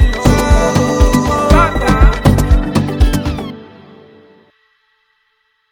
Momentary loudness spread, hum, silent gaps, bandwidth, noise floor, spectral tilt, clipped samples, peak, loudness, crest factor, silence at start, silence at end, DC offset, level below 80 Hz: 9 LU; none; none; 16.5 kHz; -62 dBFS; -6 dB/octave; under 0.1%; 0 dBFS; -12 LUFS; 12 dB; 0 s; 2.1 s; under 0.1%; -16 dBFS